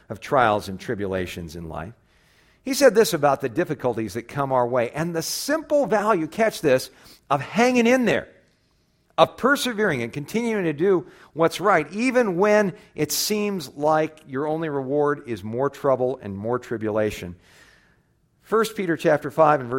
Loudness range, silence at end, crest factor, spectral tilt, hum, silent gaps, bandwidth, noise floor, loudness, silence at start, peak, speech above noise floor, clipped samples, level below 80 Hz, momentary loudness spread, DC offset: 4 LU; 0 s; 22 dB; -4.5 dB/octave; none; none; 16.5 kHz; -64 dBFS; -22 LUFS; 0.1 s; 0 dBFS; 42 dB; under 0.1%; -56 dBFS; 11 LU; under 0.1%